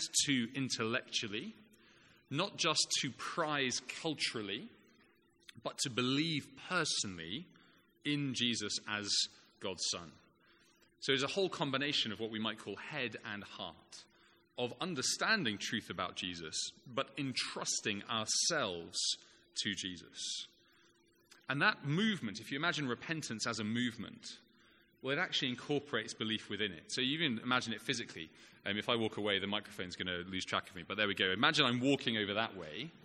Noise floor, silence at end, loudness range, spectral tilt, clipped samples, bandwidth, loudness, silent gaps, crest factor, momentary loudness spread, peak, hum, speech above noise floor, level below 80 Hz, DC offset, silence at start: -69 dBFS; 0.15 s; 3 LU; -2.5 dB/octave; under 0.1%; 14 kHz; -36 LUFS; none; 26 dB; 13 LU; -12 dBFS; none; 32 dB; -76 dBFS; under 0.1%; 0 s